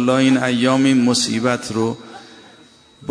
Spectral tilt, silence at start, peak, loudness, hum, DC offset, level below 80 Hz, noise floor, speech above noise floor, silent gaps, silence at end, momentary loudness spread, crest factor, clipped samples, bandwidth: -4.5 dB/octave; 0 s; -2 dBFS; -17 LUFS; none; under 0.1%; -60 dBFS; -48 dBFS; 32 dB; none; 0 s; 17 LU; 16 dB; under 0.1%; 10.5 kHz